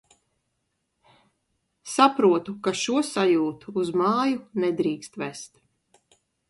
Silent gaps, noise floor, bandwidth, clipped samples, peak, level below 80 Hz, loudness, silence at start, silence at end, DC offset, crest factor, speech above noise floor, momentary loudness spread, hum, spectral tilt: none; -77 dBFS; 11.5 kHz; under 0.1%; -4 dBFS; -70 dBFS; -24 LUFS; 1.85 s; 1.05 s; under 0.1%; 22 dB; 53 dB; 14 LU; none; -4.5 dB/octave